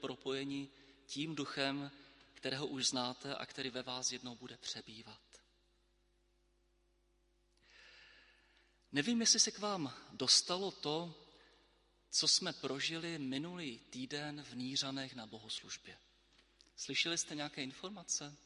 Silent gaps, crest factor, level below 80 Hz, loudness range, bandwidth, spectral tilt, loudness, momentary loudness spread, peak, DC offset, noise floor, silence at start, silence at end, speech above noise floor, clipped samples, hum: none; 26 dB; -78 dBFS; 11 LU; 11.5 kHz; -2 dB/octave; -37 LUFS; 18 LU; -16 dBFS; under 0.1%; -76 dBFS; 0 s; 0.1 s; 36 dB; under 0.1%; none